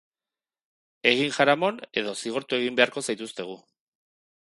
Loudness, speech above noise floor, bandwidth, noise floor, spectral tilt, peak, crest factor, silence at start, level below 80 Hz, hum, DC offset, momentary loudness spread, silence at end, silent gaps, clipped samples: -25 LUFS; over 65 dB; 11.5 kHz; under -90 dBFS; -3 dB/octave; -2 dBFS; 26 dB; 1.05 s; -76 dBFS; none; under 0.1%; 14 LU; 0.95 s; none; under 0.1%